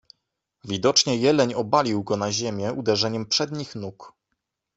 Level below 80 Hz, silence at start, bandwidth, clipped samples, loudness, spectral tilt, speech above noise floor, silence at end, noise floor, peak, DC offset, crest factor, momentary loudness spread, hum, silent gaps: -64 dBFS; 0.65 s; 8.4 kHz; under 0.1%; -22 LUFS; -4 dB/octave; 56 dB; 0.7 s; -80 dBFS; -4 dBFS; under 0.1%; 20 dB; 13 LU; none; none